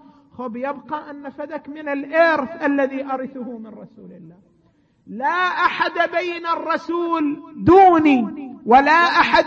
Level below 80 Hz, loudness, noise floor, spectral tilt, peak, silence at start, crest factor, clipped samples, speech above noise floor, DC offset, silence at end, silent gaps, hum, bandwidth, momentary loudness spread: -54 dBFS; -18 LUFS; -59 dBFS; -6 dB/octave; -2 dBFS; 0.4 s; 18 dB; under 0.1%; 41 dB; under 0.1%; 0 s; none; none; 7.6 kHz; 19 LU